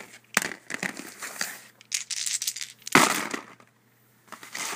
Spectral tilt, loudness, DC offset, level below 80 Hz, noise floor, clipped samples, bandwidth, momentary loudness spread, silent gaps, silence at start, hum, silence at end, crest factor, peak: -1.5 dB/octave; -27 LUFS; under 0.1%; -74 dBFS; -62 dBFS; under 0.1%; 16 kHz; 18 LU; none; 0 s; none; 0 s; 30 dB; 0 dBFS